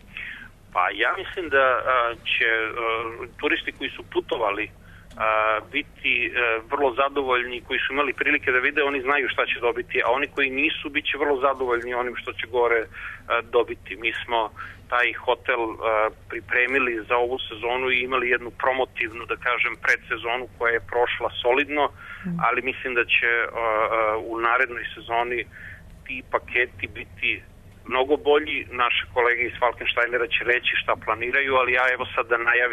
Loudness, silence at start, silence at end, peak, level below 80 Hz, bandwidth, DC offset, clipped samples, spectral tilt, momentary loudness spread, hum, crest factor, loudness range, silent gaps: -23 LUFS; 0.05 s; 0 s; -8 dBFS; -50 dBFS; 13.5 kHz; under 0.1%; under 0.1%; -5 dB/octave; 9 LU; none; 16 dB; 3 LU; none